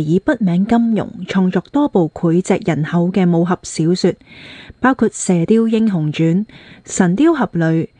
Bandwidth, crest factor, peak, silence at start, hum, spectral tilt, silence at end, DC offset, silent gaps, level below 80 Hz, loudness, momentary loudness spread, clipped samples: 10 kHz; 14 dB; 0 dBFS; 0 s; none; -6.5 dB/octave; 0.15 s; under 0.1%; none; -50 dBFS; -16 LUFS; 7 LU; under 0.1%